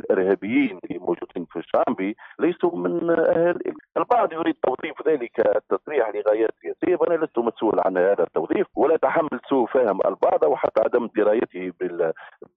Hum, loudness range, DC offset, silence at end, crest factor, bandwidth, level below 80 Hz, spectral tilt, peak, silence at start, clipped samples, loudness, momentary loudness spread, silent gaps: none; 2 LU; under 0.1%; 0.25 s; 14 dB; 4 kHz; -68 dBFS; -5 dB/octave; -8 dBFS; 0.05 s; under 0.1%; -22 LUFS; 8 LU; none